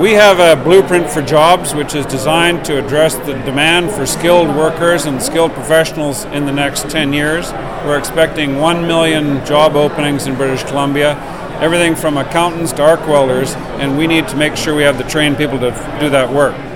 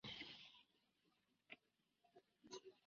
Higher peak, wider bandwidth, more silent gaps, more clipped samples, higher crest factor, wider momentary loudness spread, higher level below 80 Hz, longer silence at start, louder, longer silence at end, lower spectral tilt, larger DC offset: first, 0 dBFS vs -38 dBFS; first, 18.5 kHz vs 7 kHz; neither; first, 0.5% vs under 0.1%; second, 12 dB vs 24 dB; about the same, 8 LU vs 10 LU; first, -34 dBFS vs -88 dBFS; about the same, 0 s vs 0.05 s; first, -12 LUFS vs -59 LUFS; about the same, 0 s vs 0 s; first, -4.5 dB/octave vs -1.5 dB/octave; first, 2% vs under 0.1%